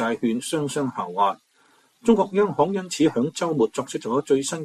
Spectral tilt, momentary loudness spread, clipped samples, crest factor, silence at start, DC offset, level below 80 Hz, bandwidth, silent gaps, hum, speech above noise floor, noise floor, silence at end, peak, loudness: -5 dB/octave; 6 LU; under 0.1%; 18 dB; 0 s; under 0.1%; -62 dBFS; 14 kHz; none; none; 38 dB; -60 dBFS; 0 s; -6 dBFS; -23 LUFS